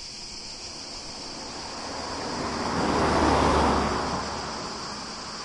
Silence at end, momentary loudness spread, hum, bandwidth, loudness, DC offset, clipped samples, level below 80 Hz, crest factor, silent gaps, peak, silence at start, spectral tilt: 0 s; 14 LU; none; 11.5 kHz; -28 LUFS; under 0.1%; under 0.1%; -40 dBFS; 18 dB; none; -10 dBFS; 0 s; -4 dB/octave